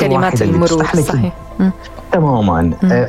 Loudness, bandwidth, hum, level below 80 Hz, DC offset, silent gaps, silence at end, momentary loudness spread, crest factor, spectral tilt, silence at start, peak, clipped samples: -14 LUFS; 14 kHz; none; -32 dBFS; under 0.1%; none; 0 s; 5 LU; 12 dB; -6.5 dB/octave; 0 s; 0 dBFS; under 0.1%